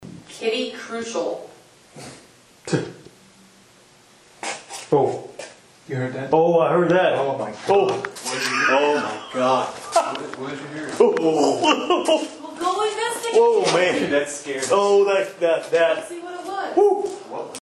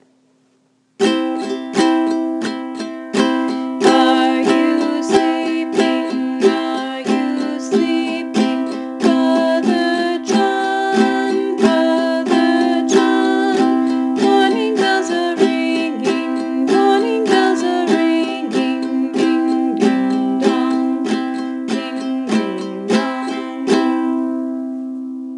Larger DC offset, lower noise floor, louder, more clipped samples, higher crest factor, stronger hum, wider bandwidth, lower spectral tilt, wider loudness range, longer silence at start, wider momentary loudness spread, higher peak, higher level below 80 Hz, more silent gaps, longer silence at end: neither; second, -52 dBFS vs -59 dBFS; second, -21 LUFS vs -17 LUFS; neither; about the same, 20 dB vs 16 dB; neither; about the same, 12.5 kHz vs 11.5 kHz; about the same, -4 dB/octave vs -4.5 dB/octave; first, 10 LU vs 4 LU; second, 0 s vs 1 s; first, 15 LU vs 8 LU; about the same, -2 dBFS vs 0 dBFS; about the same, -66 dBFS vs -66 dBFS; neither; about the same, 0.05 s vs 0 s